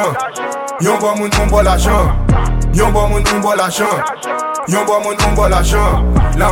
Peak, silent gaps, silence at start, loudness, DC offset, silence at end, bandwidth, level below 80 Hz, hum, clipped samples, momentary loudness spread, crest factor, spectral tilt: 0 dBFS; none; 0 s; -14 LUFS; under 0.1%; 0 s; 17 kHz; -16 dBFS; none; under 0.1%; 7 LU; 12 dB; -5 dB/octave